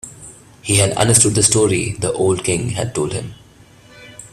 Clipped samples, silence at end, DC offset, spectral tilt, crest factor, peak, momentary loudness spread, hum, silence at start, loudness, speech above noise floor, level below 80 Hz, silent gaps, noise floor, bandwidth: under 0.1%; 0.05 s; under 0.1%; -3.5 dB/octave; 18 dB; 0 dBFS; 19 LU; none; 0.05 s; -15 LUFS; 29 dB; -44 dBFS; none; -46 dBFS; 15.5 kHz